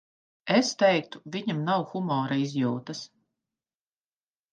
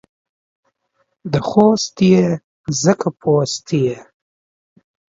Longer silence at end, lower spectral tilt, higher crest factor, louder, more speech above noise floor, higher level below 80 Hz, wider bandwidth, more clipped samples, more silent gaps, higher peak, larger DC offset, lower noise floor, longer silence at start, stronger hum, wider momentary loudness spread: first, 1.45 s vs 1.1 s; about the same, -5 dB/octave vs -6 dB/octave; about the same, 20 dB vs 18 dB; second, -27 LUFS vs -16 LUFS; first, over 63 dB vs 52 dB; second, -78 dBFS vs -54 dBFS; first, 9.8 kHz vs 7.8 kHz; neither; second, none vs 2.44-2.64 s; second, -8 dBFS vs 0 dBFS; neither; first, under -90 dBFS vs -67 dBFS; second, 0.45 s vs 1.25 s; neither; first, 16 LU vs 10 LU